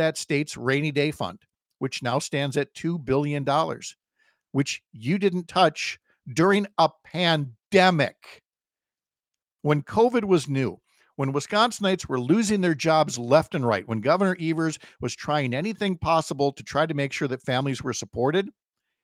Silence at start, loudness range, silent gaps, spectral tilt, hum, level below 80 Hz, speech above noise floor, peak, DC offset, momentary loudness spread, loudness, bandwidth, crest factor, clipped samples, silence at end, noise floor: 0 s; 4 LU; none; -5 dB/octave; none; -60 dBFS; over 66 dB; -4 dBFS; under 0.1%; 10 LU; -24 LUFS; 15.5 kHz; 20 dB; under 0.1%; 0.55 s; under -90 dBFS